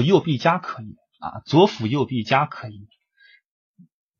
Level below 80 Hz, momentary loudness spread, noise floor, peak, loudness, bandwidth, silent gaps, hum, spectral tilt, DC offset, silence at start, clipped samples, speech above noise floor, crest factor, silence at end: -64 dBFS; 19 LU; -56 dBFS; -2 dBFS; -20 LUFS; 7.2 kHz; none; none; -7 dB/octave; under 0.1%; 0 s; under 0.1%; 36 dB; 20 dB; 1.35 s